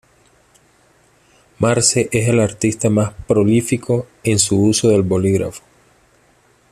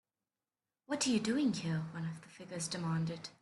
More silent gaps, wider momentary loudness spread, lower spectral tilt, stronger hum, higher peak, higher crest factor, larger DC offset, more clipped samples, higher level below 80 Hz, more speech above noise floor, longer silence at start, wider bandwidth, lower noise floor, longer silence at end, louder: neither; second, 6 LU vs 11 LU; about the same, -5 dB/octave vs -4.5 dB/octave; neither; first, 0 dBFS vs -22 dBFS; about the same, 16 dB vs 16 dB; neither; neither; first, -48 dBFS vs -74 dBFS; second, 39 dB vs over 54 dB; first, 1.6 s vs 0.9 s; first, 14 kHz vs 12 kHz; second, -55 dBFS vs under -90 dBFS; first, 1.15 s vs 0.1 s; first, -16 LUFS vs -36 LUFS